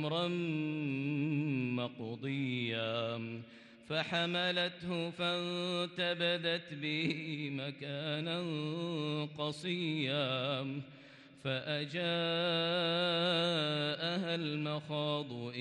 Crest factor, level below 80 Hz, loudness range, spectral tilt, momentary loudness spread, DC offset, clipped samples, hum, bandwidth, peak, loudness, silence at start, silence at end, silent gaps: 16 dB; -80 dBFS; 4 LU; -6 dB/octave; 8 LU; under 0.1%; under 0.1%; none; 10.5 kHz; -20 dBFS; -35 LUFS; 0 s; 0 s; none